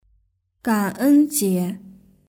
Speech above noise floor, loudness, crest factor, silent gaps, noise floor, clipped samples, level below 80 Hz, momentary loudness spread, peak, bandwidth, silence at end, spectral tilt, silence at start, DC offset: 46 dB; -20 LUFS; 14 dB; none; -65 dBFS; under 0.1%; -62 dBFS; 13 LU; -8 dBFS; 19.5 kHz; 0.4 s; -5.5 dB/octave; 0.65 s; under 0.1%